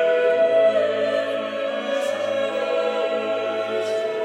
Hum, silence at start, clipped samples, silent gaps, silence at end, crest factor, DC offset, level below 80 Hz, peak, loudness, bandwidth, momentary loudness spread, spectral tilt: none; 0 s; under 0.1%; none; 0 s; 14 dB; under 0.1%; -84 dBFS; -8 dBFS; -22 LUFS; 11 kHz; 7 LU; -3.5 dB/octave